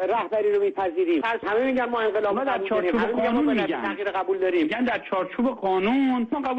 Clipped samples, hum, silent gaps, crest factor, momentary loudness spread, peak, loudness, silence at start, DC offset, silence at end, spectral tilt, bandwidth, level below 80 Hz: under 0.1%; none; none; 10 dB; 4 LU; -14 dBFS; -24 LUFS; 0 s; under 0.1%; 0 s; -7 dB/octave; 8 kHz; -58 dBFS